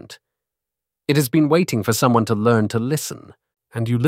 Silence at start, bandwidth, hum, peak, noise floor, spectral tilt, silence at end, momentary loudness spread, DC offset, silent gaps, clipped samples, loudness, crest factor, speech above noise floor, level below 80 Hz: 0.05 s; 16 kHz; none; -2 dBFS; -86 dBFS; -6 dB/octave; 0 s; 14 LU; under 0.1%; none; under 0.1%; -19 LUFS; 18 dB; 67 dB; -58 dBFS